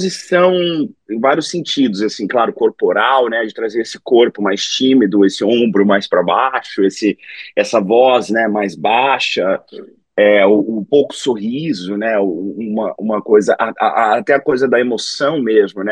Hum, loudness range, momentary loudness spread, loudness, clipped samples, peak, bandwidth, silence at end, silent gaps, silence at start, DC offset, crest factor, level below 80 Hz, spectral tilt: none; 2 LU; 8 LU; -14 LUFS; under 0.1%; 0 dBFS; 10 kHz; 0 s; none; 0 s; under 0.1%; 14 dB; -64 dBFS; -4.5 dB/octave